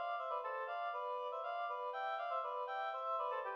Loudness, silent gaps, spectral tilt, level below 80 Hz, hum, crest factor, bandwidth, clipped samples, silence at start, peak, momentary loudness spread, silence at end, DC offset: -41 LUFS; none; -0.5 dB/octave; under -90 dBFS; none; 12 dB; 7 kHz; under 0.1%; 0 s; -30 dBFS; 2 LU; 0 s; under 0.1%